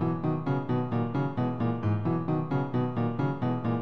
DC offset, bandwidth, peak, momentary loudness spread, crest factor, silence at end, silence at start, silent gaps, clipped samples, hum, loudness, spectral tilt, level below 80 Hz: 0.6%; 5.8 kHz; -16 dBFS; 1 LU; 12 dB; 0 s; 0 s; none; under 0.1%; none; -29 LUFS; -10.5 dB/octave; -60 dBFS